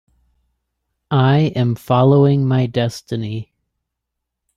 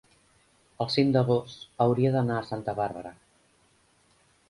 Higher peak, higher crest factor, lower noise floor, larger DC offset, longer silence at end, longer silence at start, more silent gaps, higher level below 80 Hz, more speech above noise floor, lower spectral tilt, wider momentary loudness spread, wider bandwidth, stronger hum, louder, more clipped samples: first, -2 dBFS vs -10 dBFS; about the same, 16 dB vs 20 dB; first, -79 dBFS vs -65 dBFS; neither; second, 1.15 s vs 1.4 s; first, 1.1 s vs 0.8 s; neither; first, -54 dBFS vs -62 dBFS; first, 64 dB vs 39 dB; about the same, -8 dB/octave vs -7.5 dB/octave; second, 12 LU vs 15 LU; about the same, 12 kHz vs 11.5 kHz; neither; first, -16 LUFS vs -27 LUFS; neither